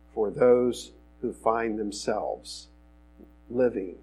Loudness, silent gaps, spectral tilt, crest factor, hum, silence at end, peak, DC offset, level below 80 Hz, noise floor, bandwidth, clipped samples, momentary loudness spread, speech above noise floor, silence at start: -27 LUFS; none; -5 dB/octave; 20 dB; 60 Hz at -55 dBFS; 0.1 s; -8 dBFS; under 0.1%; -54 dBFS; -54 dBFS; 12.5 kHz; under 0.1%; 17 LU; 27 dB; 0.15 s